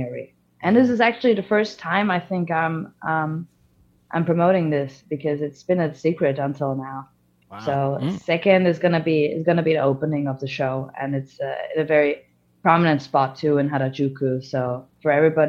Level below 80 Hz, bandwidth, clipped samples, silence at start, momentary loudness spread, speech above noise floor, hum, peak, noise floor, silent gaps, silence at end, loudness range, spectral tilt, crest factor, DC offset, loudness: -64 dBFS; 7.4 kHz; under 0.1%; 0 s; 10 LU; 38 dB; none; 0 dBFS; -59 dBFS; none; 0 s; 3 LU; -8 dB/octave; 20 dB; under 0.1%; -22 LUFS